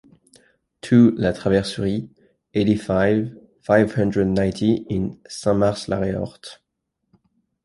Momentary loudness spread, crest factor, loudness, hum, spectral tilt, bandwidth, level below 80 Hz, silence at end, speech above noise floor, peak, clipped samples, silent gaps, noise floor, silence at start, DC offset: 15 LU; 18 dB; -20 LUFS; none; -7 dB/octave; 11.5 kHz; -46 dBFS; 1.1 s; 57 dB; -2 dBFS; under 0.1%; none; -77 dBFS; 0.85 s; under 0.1%